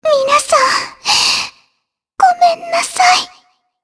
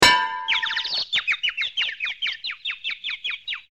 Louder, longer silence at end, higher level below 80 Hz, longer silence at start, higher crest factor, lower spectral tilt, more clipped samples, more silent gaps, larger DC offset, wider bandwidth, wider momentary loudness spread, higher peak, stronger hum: first, -12 LUFS vs -23 LUFS; first, 0.55 s vs 0.1 s; about the same, -56 dBFS vs -54 dBFS; about the same, 0.05 s vs 0 s; second, 14 dB vs 22 dB; about the same, 0.5 dB/octave vs -0.5 dB/octave; neither; neither; second, under 0.1% vs 0.1%; second, 11 kHz vs 16.5 kHz; about the same, 6 LU vs 7 LU; about the same, 0 dBFS vs -2 dBFS; neither